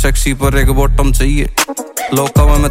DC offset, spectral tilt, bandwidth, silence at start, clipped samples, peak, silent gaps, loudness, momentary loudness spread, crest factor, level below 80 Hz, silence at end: under 0.1%; -5 dB/octave; 16.5 kHz; 0 s; under 0.1%; 0 dBFS; none; -13 LUFS; 5 LU; 10 dB; -12 dBFS; 0 s